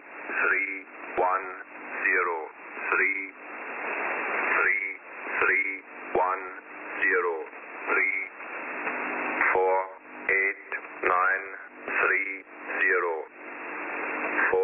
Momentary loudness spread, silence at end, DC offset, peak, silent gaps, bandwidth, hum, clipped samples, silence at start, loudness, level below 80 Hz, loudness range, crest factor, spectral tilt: 14 LU; 0 s; under 0.1%; -6 dBFS; none; 3.7 kHz; none; under 0.1%; 0 s; -27 LUFS; -70 dBFS; 2 LU; 22 dB; -1.5 dB/octave